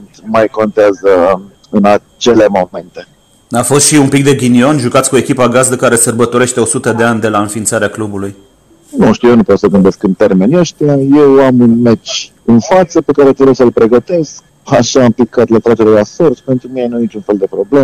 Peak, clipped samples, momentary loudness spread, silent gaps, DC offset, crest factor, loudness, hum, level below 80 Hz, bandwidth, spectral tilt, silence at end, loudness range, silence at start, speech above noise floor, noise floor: 0 dBFS; under 0.1%; 9 LU; none; under 0.1%; 8 dB; -9 LUFS; none; -42 dBFS; 14.5 kHz; -5 dB/octave; 0 s; 3 LU; 0 s; 35 dB; -44 dBFS